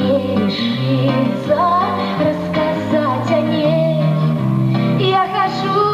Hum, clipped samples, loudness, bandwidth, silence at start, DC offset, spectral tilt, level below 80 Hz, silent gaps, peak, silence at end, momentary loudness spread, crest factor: none; under 0.1%; -16 LUFS; 13.5 kHz; 0 s; under 0.1%; -8 dB/octave; -50 dBFS; none; -4 dBFS; 0 s; 3 LU; 12 dB